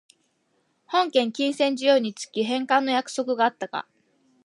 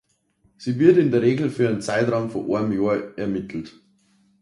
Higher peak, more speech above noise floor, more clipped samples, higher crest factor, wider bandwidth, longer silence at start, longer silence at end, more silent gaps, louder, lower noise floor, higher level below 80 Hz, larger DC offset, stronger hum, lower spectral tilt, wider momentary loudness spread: second, -6 dBFS vs -2 dBFS; about the same, 46 dB vs 43 dB; neither; about the same, 20 dB vs 20 dB; about the same, 11.5 kHz vs 11.5 kHz; first, 0.9 s vs 0.6 s; about the same, 0.65 s vs 0.7 s; neither; second, -24 LUFS vs -21 LUFS; first, -70 dBFS vs -64 dBFS; second, -82 dBFS vs -58 dBFS; neither; neither; second, -3.5 dB/octave vs -7.5 dB/octave; second, 9 LU vs 15 LU